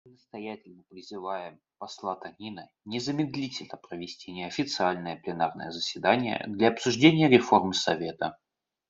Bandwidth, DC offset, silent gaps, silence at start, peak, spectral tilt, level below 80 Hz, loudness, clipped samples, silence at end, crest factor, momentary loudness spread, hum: 7.8 kHz; under 0.1%; none; 0.35 s; -4 dBFS; -5 dB/octave; -70 dBFS; -27 LUFS; under 0.1%; 0.55 s; 24 dB; 21 LU; none